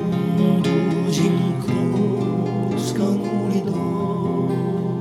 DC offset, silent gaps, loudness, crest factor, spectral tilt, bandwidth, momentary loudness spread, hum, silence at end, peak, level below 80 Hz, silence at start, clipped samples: under 0.1%; none; -21 LUFS; 14 dB; -7.5 dB/octave; 13 kHz; 4 LU; none; 0 s; -6 dBFS; -56 dBFS; 0 s; under 0.1%